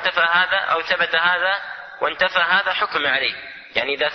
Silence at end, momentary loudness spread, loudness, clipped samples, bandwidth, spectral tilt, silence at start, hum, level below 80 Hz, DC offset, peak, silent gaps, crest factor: 0 s; 9 LU; -19 LUFS; under 0.1%; 6.2 kHz; -3 dB/octave; 0 s; none; -60 dBFS; under 0.1%; -4 dBFS; none; 16 dB